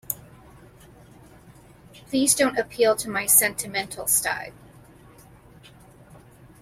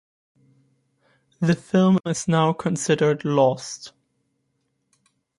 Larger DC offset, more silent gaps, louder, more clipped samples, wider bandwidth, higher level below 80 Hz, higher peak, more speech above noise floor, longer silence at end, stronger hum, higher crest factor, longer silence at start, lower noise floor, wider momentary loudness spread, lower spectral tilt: neither; neither; about the same, -21 LUFS vs -21 LUFS; neither; first, 16.5 kHz vs 11.5 kHz; first, -58 dBFS vs -64 dBFS; first, -2 dBFS vs -6 dBFS; second, 27 dB vs 52 dB; second, 0.45 s vs 1.5 s; neither; first, 24 dB vs 18 dB; second, 0.1 s vs 1.4 s; second, -50 dBFS vs -73 dBFS; about the same, 15 LU vs 13 LU; second, -2 dB/octave vs -6 dB/octave